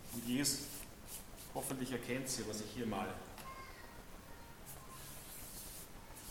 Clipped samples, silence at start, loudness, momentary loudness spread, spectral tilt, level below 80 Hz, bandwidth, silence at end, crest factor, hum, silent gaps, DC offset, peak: under 0.1%; 0 s; -43 LUFS; 17 LU; -3 dB/octave; -60 dBFS; 17.5 kHz; 0 s; 24 dB; none; none; under 0.1%; -22 dBFS